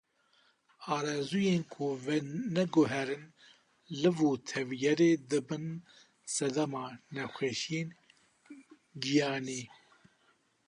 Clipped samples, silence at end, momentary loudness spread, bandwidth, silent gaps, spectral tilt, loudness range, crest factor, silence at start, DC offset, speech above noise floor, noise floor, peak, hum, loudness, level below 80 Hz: under 0.1%; 1 s; 14 LU; 11 kHz; none; -5 dB/octave; 6 LU; 18 dB; 0.8 s; under 0.1%; 39 dB; -71 dBFS; -16 dBFS; none; -33 LUFS; -76 dBFS